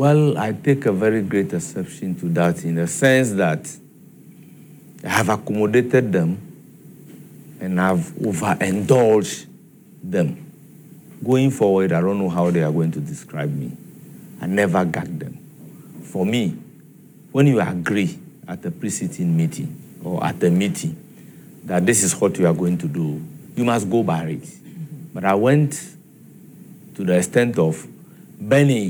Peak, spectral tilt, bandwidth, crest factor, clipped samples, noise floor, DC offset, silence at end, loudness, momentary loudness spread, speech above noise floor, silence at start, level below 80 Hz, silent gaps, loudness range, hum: -2 dBFS; -6 dB/octave; over 20 kHz; 18 dB; under 0.1%; -46 dBFS; under 0.1%; 0 s; -20 LUFS; 19 LU; 27 dB; 0 s; -62 dBFS; none; 3 LU; none